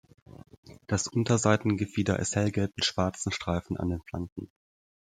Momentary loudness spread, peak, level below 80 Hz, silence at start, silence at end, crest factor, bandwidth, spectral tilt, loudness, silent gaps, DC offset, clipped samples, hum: 12 LU; -8 dBFS; -56 dBFS; 0.65 s; 0.7 s; 22 dB; 9.6 kHz; -5 dB/octave; -29 LUFS; 4.32-4.36 s; under 0.1%; under 0.1%; none